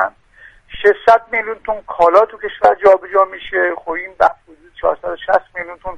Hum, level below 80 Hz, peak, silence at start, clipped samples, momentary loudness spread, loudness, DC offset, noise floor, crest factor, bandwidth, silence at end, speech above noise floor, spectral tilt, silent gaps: none; -46 dBFS; 0 dBFS; 0 s; under 0.1%; 12 LU; -15 LUFS; under 0.1%; -45 dBFS; 16 dB; 9.2 kHz; 0 s; 30 dB; -5 dB/octave; none